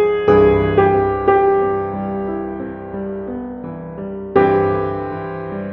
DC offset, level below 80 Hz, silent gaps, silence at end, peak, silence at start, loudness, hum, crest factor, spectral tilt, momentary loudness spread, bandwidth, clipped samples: under 0.1%; -40 dBFS; none; 0 s; 0 dBFS; 0 s; -17 LUFS; none; 16 dB; -6.5 dB/octave; 15 LU; 4.3 kHz; under 0.1%